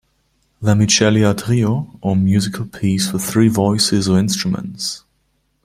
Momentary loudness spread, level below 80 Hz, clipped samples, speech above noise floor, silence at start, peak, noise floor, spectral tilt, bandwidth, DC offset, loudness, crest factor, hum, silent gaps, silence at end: 11 LU; -48 dBFS; under 0.1%; 49 dB; 0.6 s; 0 dBFS; -64 dBFS; -5 dB/octave; 16 kHz; under 0.1%; -16 LUFS; 16 dB; none; none; 0.65 s